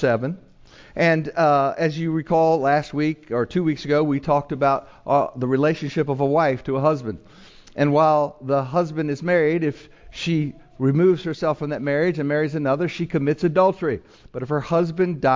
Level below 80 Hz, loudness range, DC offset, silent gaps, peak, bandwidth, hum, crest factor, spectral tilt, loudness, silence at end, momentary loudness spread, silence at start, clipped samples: -54 dBFS; 2 LU; under 0.1%; none; -4 dBFS; 7.6 kHz; none; 16 dB; -7.5 dB/octave; -21 LUFS; 0 s; 9 LU; 0 s; under 0.1%